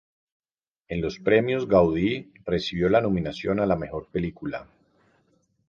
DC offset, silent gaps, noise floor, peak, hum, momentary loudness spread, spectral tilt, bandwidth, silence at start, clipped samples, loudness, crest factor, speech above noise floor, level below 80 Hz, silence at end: under 0.1%; none; -67 dBFS; -6 dBFS; none; 12 LU; -7.5 dB/octave; 7.2 kHz; 0.9 s; under 0.1%; -25 LUFS; 20 dB; 43 dB; -48 dBFS; 1.05 s